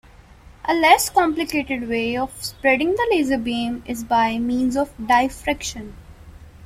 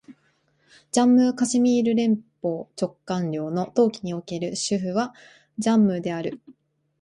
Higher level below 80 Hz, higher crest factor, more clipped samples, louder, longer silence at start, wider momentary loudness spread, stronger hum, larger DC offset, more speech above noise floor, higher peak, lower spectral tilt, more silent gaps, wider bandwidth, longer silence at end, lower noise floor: first, -44 dBFS vs -66 dBFS; about the same, 20 dB vs 16 dB; neither; first, -20 LUFS vs -23 LUFS; first, 0.5 s vs 0.1 s; about the same, 12 LU vs 12 LU; neither; neither; second, 26 dB vs 44 dB; first, -2 dBFS vs -8 dBFS; second, -3.5 dB/octave vs -5.5 dB/octave; neither; first, 16.5 kHz vs 11.5 kHz; second, 0 s vs 0.5 s; second, -46 dBFS vs -66 dBFS